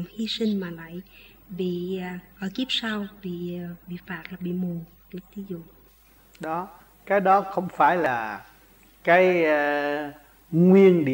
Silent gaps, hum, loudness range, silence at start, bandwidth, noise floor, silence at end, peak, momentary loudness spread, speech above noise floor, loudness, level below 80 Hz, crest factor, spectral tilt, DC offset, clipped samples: none; none; 12 LU; 0 s; 16.5 kHz; -55 dBFS; 0 s; -6 dBFS; 21 LU; 32 dB; -23 LUFS; -60 dBFS; 18 dB; -7 dB/octave; under 0.1%; under 0.1%